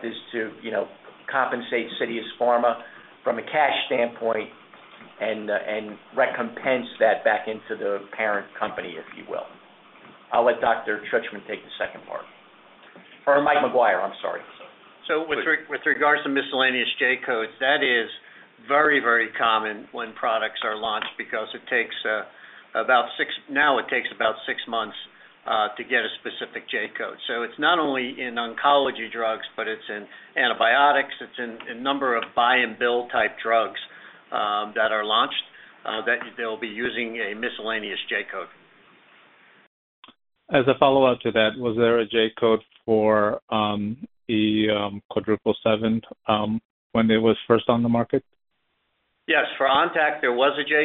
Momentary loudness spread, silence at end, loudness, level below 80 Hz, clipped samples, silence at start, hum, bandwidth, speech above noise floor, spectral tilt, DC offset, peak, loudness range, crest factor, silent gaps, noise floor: 13 LU; 0 s; -23 LUFS; -64 dBFS; under 0.1%; 0 s; none; 4.2 kHz; 49 dB; -1.5 dB/octave; under 0.1%; -2 dBFS; 5 LU; 22 dB; 39.67-40.03 s, 43.42-43.48 s, 45.05-45.09 s, 46.65-46.90 s; -73 dBFS